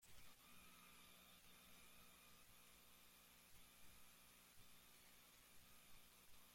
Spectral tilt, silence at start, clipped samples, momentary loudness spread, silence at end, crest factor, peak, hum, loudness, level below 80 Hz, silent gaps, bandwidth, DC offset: -1.5 dB/octave; 0 s; under 0.1%; 2 LU; 0 s; 14 dB; -52 dBFS; 60 Hz at -80 dBFS; -67 LUFS; -80 dBFS; none; 16.5 kHz; under 0.1%